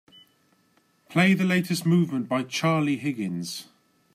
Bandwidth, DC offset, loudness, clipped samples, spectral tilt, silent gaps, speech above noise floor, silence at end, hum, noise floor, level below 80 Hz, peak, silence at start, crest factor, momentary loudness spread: 15.5 kHz; under 0.1%; -24 LUFS; under 0.1%; -5.5 dB/octave; none; 41 dB; 0.5 s; none; -65 dBFS; -70 dBFS; -8 dBFS; 1.1 s; 18 dB; 10 LU